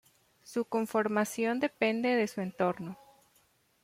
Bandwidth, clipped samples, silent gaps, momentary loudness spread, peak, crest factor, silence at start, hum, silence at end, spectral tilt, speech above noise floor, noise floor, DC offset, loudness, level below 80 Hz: 16 kHz; under 0.1%; none; 10 LU; -14 dBFS; 20 dB; 0.45 s; none; 0.9 s; -5 dB/octave; 38 dB; -69 dBFS; under 0.1%; -31 LUFS; -76 dBFS